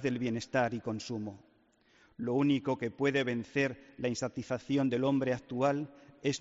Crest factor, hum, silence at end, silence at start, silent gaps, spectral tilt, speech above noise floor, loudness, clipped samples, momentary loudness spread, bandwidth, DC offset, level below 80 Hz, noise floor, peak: 16 dB; none; 0 s; 0 s; none; -5 dB/octave; 35 dB; -33 LUFS; under 0.1%; 9 LU; 7.6 kHz; under 0.1%; -68 dBFS; -67 dBFS; -16 dBFS